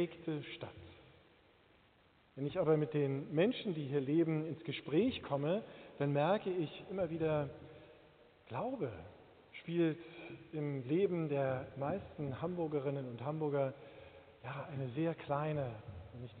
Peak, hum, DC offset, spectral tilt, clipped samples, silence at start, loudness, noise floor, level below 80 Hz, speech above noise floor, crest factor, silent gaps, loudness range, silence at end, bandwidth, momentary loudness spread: -18 dBFS; none; under 0.1%; -6.5 dB/octave; under 0.1%; 0 s; -38 LUFS; -69 dBFS; -70 dBFS; 32 dB; 20 dB; none; 5 LU; 0 s; 4.6 kHz; 18 LU